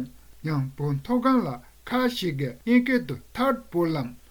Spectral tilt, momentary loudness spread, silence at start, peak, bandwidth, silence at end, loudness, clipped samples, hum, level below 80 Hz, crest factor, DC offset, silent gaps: -7 dB/octave; 12 LU; 0 s; -8 dBFS; over 20 kHz; 0.15 s; -26 LUFS; under 0.1%; none; -54 dBFS; 16 dB; under 0.1%; none